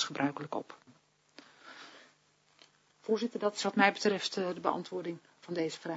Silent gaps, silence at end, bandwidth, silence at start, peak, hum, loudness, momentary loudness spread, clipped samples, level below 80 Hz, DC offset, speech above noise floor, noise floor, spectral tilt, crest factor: none; 0 s; 7.6 kHz; 0 s; -12 dBFS; none; -33 LUFS; 24 LU; under 0.1%; -86 dBFS; under 0.1%; 36 dB; -69 dBFS; -2.5 dB/octave; 24 dB